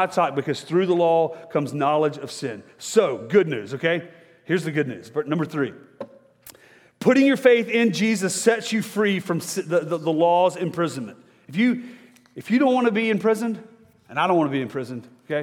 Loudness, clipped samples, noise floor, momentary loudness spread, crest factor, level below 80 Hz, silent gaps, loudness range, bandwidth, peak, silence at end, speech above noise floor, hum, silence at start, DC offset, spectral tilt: -22 LUFS; under 0.1%; -53 dBFS; 13 LU; 18 dB; -74 dBFS; none; 4 LU; 17.5 kHz; -4 dBFS; 0 s; 31 dB; none; 0 s; under 0.1%; -5 dB/octave